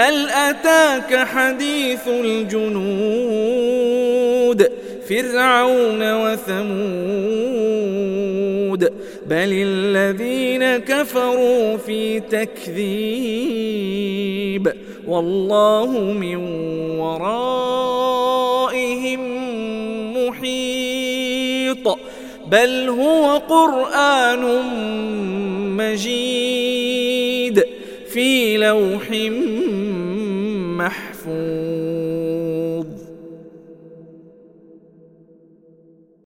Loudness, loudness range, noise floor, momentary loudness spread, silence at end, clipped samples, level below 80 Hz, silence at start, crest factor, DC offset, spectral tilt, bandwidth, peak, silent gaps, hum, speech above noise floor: -19 LUFS; 6 LU; -51 dBFS; 9 LU; 2.1 s; under 0.1%; -56 dBFS; 0 s; 18 dB; under 0.1%; -4.5 dB/octave; 16.5 kHz; 0 dBFS; none; none; 33 dB